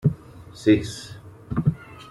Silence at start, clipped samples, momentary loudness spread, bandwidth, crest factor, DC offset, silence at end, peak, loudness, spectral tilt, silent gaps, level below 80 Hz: 0.05 s; under 0.1%; 21 LU; 12 kHz; 18 dB; under 0.1%; 0.05 s; -6 dBFS; -24 LUFS; -7 dB/octave; none; -48 dBFS